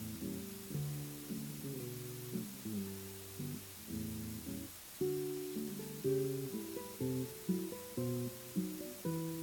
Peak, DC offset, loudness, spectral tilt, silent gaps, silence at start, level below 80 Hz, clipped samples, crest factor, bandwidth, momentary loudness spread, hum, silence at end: -24 dBFS; under 0.1%; -42 LUFS; -5.5 dB/octave; none; 0 s; -66 dBFS; under 0.1%; 18 dB; 18 kHz; 7 LU; none; 0 s